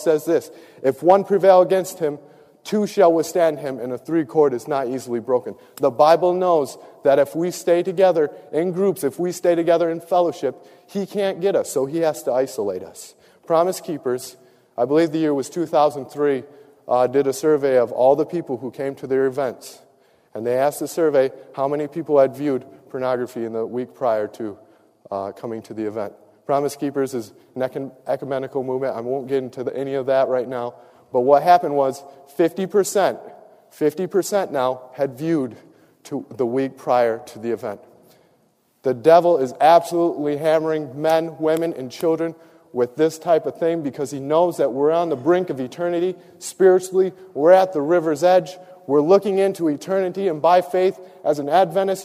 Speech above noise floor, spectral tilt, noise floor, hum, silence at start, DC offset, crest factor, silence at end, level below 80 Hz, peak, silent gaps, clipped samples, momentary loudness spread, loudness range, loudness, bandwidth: 42 dB; -5.5 dB/octave; -62 dBFS; none; 0 s; under 0.1%; 18 dB; 0 s; -70 dBFS; -2 dBFS; none; under 0.1%; 13 LU; 7 LU; -20 LUFS; 15.5 kHz